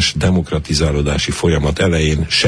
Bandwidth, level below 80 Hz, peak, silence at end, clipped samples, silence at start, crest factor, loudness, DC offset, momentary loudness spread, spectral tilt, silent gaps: 11 kHz; -26 dBFS; -2 dBFS; 0 s; under 0.1%; 0 s; 12 dB; -16 LUFS; under 0.1%; 3 LU; -4.5 dB/octave; none